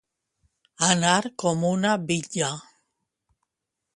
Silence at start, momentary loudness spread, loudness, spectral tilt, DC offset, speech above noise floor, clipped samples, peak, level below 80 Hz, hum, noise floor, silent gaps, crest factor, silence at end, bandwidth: 0.8 s; 7 LU; -23 LUFS; -3.5 dB/octave; under 0.1%; 60 dB; under 0.1%; -4 dBFS; -64 dBFS; none; -84 dBFS; none; 22 dB; 1.35 s; 11.5 kHz